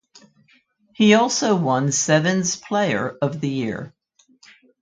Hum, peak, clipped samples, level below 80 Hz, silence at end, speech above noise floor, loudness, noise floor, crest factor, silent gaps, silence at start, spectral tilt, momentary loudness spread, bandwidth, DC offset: none; -2 dBFS; under 0.1%; -62 dBFS; 0.95 s; 40 dB; -19 LUFS; -59 dBFS; 20 dB; none; 1 s; -4.5 dB/octave; 10 LU; 9.4 kHz; under 0.1%